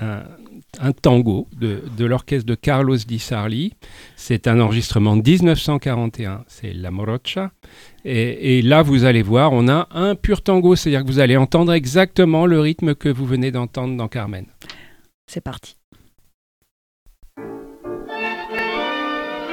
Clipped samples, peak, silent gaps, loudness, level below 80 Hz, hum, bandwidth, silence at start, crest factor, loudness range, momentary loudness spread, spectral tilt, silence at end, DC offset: under 0.1%; -2 dBFS; 15.14-15.28 s, 15.84-15.92 s, 16.34-16.62 s, 16.71-17.06 s; -17 LUFS; -38 dBFS; none; 15.5 kHz; 0 s; 16 dB; 16 LU; 18 LU; -7 dB/octave; 0 s; under 0.1%